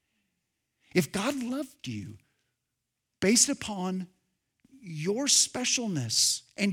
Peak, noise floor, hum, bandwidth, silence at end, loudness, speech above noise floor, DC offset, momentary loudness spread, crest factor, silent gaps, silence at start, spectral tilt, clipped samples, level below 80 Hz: -6 dBFS; -84 dBFS; none; 19.5 kHz; 0 s; -26 LUFS; 55 dB; under 0.1%; 17 LU; 24 dB; none; 0.95 s; -2.5 dB/octave; under 0.1%; -68 dBFS